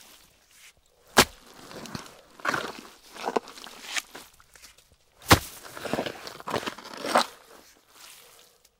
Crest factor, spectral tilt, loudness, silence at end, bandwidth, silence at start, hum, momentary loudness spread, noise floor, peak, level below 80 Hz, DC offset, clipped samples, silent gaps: 28 dB; -3 dB/octave; -27 LUFS; 0.65 s; 17 kHz; 0.65 s; none; 26 LU; -60 dBFS; -4 dBFS; -50 dBFS; under 0.1%; under 0.1%; none